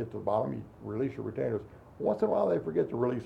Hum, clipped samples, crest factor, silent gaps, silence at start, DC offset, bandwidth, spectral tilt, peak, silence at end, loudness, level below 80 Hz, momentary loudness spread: none; under 0.1%; 16 dB; none; 0 s; under 0.1%; 8.2 kHz; -9.5 dB/octave; -16 dBFS; 0 s; -32 LUFS; -62 dBFS; 10 LU